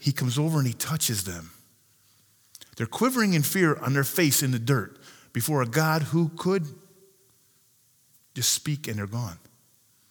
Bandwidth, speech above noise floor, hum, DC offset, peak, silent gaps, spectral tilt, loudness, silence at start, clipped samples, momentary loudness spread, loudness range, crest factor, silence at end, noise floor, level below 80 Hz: over 20 kHz; 38 dB; none; under 0.1%; -8 dBFS; none; -4.5 dB/octave; -25 LUFS; 0 s; under 0.1%; 13 LU; 6 LU; 20 dB; 0.75 s; -63 dBFS; -66 dBFS